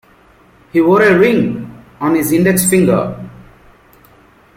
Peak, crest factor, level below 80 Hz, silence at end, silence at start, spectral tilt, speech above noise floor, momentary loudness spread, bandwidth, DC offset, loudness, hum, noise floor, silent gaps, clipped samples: 0 dBFS; 14 dB; -46 dBFS; 1.15 s; 0.75 s; -5.5 dB/octave; 35 dB; 18 LU; 16.5 kHz; under 0.1%; -12 LUFS; none; -47 dBFS; none; under 0.1%